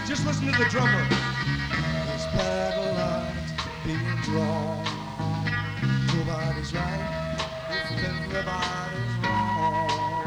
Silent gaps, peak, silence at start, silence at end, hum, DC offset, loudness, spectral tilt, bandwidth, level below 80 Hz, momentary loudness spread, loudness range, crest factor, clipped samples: none; -10 dBFS; 0 s; 0 s; none; under 0.1%; -27 LUFS; -5.5 dB/octave; 11.5 kHz; -42 dBFS; 8 LU; 3 LU; 16 dB; under 0.1%